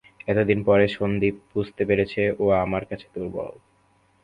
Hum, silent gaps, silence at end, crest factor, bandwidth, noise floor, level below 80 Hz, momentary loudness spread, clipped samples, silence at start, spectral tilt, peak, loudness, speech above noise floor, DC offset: none; none; 0.7 s; 20 dB; 5.2 kHz; -62 dBFS; -48 dBFS; 13 LU; under 0.1%; 0.25 s; -8.5 dB/octave; -4 dBFS; -23 LUFS; 39 dB; under 0.1%